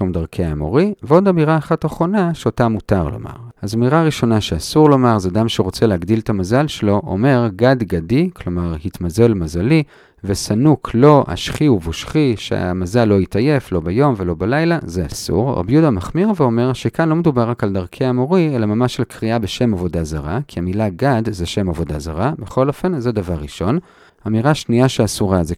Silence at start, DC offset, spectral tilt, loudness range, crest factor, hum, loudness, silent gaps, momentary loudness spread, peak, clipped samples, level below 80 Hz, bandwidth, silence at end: 0 s; under 0.1%; -7 dB/octave; 4 LU; 16 dB; none; -17 LUFS; none; 8 LU; 0 dBFS; under 0.1%; -36 dBFS; 15 kHz; 0 s